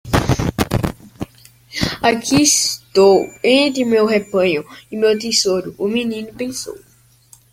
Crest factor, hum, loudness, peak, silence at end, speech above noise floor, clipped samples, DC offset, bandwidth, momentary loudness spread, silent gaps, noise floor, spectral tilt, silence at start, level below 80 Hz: 16 dB; none; -16 LUFS; 0 dBFS; 0.75 s; 33 dB; under 0.1%; under 0.1%; 16.5 kHz; 16 LU; none; -49 dBFS; -3.5 dB/octave; 0.05 s; -38 dBFS